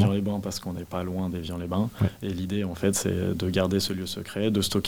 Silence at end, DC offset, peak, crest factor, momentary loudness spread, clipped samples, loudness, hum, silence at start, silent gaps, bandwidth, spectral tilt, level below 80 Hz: 0 s; 0.2%; -10 dBFS; 16 dB; 8 LU; under 0.1%; -28 LUFS; none; 0 s; none; 18 kHz; -5.5 dB/octave; -52 dBFS